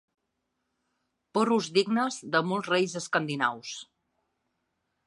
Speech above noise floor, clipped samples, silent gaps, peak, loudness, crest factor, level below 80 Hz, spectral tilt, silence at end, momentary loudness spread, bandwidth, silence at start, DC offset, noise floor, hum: 53 dB; under 0.1%; none; -10 dBFS; -27 LUFS; 22 dB; -80 dBFS; -4 dB/octave; 1.25 s; 9 LU; 11.5 kHz; 1.35 s; under 0.1%; -80 dBFS; none